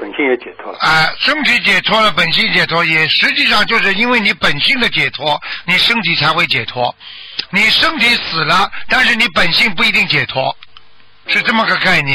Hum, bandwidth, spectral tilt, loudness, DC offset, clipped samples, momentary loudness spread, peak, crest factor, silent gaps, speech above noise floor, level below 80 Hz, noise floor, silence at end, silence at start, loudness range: none; 15.5 kHz; -3.5 dB/octave; -11 LUFS; under 0.1%; under 0.1%; 9 LU; -2 dBFS; 12 dB; none; 32 dB; -42 dBFS; -45 dBFS; 0 s; 0 s; 2 LU